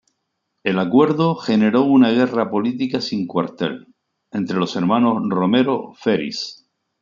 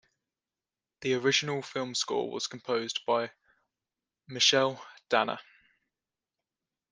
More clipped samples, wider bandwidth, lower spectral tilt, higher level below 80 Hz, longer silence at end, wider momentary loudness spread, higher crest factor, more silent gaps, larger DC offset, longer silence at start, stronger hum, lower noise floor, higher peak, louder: neither; second, 7.4 kHz vs 10 kHz; first, -7 dB/octave vs -2.5 dB/octave; first, -64 dBFS vs -78 dBFS; second, 0.45 s vs 1.5 s; about the same, 12 LU vs 14 LU; second, 18 dB vs 24 dB; neither; neither; second, 0.65 s vs 1 s; neither; second, -74 dBFS vs under -90 dBFS; first, 0 dBFS vs -10 dBFS; first, -18 LUFS vs -29 LUFS